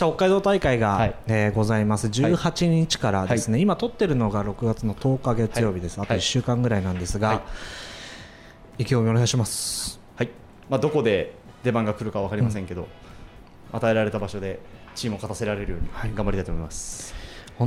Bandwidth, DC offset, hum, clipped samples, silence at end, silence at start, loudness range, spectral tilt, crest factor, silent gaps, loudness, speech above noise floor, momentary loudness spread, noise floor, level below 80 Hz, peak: 15.5 kHz; under 0.1%; none; under 0.1%; 0 s; 0 s; 6 LU; -5.5 dB/octave; 16 dB; none; -24 LUFS; 23 dB; 15 LU; -46 dBFS; -40 dBFS; -8 dBFS